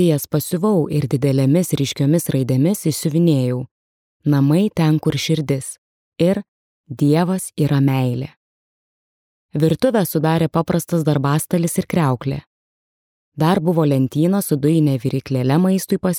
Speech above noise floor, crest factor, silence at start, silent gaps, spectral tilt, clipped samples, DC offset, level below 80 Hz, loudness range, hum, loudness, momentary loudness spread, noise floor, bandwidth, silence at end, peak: over 73 dB; 14 dB; 0 s; 3.71-4.20 s, 5.78-6.12 s, 6.48-6.84 s, 8.37-9.49 s, 12.47-13.32 s; -6.5 dB/octave; under 0.1%; under 0.1%; -54 dBFS; 3 LU; none; -18 LUFS; 7 LU; under -90 dBFS; 17 kHz; 0 s; -4 dBFS